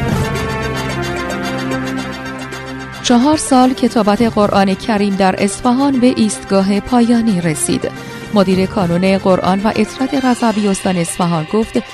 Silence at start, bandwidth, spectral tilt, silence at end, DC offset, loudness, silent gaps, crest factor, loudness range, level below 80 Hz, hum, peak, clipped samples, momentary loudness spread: 0 s; 14 kHz; -5.5 dB/octave; 0 s; under 0.1%; -14 LUFS; none; 14 dB; 3 LU; -38 dBFS; none; 0 dBFS; under 0.1%; 8 LU